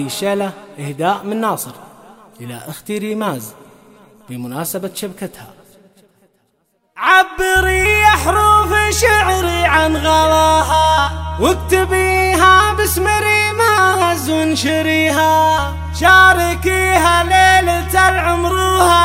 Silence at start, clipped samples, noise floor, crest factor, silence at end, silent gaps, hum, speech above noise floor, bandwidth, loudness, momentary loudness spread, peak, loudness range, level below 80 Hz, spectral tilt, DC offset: 0 s; under 0.1%; -63 dBFS; 14 dB; 0 s; none; none; 50 dB; 16.5 kHz; -13 LUFS; 15 LU; 0 dBFS; 14 LU; -28 dBFS; -3.5 dB/octave; under 0.1%